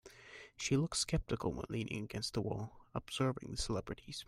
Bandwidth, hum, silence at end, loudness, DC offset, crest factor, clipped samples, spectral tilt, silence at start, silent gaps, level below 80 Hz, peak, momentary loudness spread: 15.5 kHz; none; 0.05 s; -39 LUFS; under 0.1%; 18 dB; under 0.1%; -4.5 dB/octave; 0.05 s; none; -54 dBFS; -22 dBFS; 11 LU